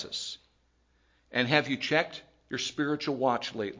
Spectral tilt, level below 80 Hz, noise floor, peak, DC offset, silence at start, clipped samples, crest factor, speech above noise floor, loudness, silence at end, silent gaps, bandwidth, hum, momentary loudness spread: -4 dB/octave; -70 dBFS; -69 dBFS; -8 dBFS; under 0.1%; 0 s; under 0.1%; 24 dB; 39 dB; -30 LUFS; 0 s; none; 7.6 kHz; none; 13 LU